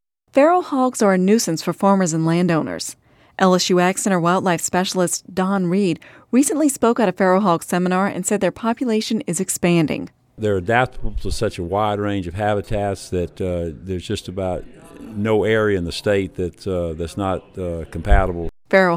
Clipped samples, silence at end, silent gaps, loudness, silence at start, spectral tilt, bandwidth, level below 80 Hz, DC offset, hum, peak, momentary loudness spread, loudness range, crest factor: under 0.1%; 0 s; none; -20 LUFS; 0.35 s; -5 dB/octave; 16.5 kHz; -32 dBFS; under 0.1%; none; 0 dBFS; 10 LU; 5 LU; 18 dB